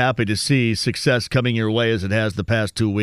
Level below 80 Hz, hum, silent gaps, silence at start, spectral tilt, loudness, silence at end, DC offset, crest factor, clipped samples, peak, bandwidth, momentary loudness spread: -46 dBFS; none; none; 0 s; -5.5 dB/octave; -20 LUFS; 0 s; under 0.1%; 18 dB; under 0.1%; -2 dBFS; 14 kHz; 3 LU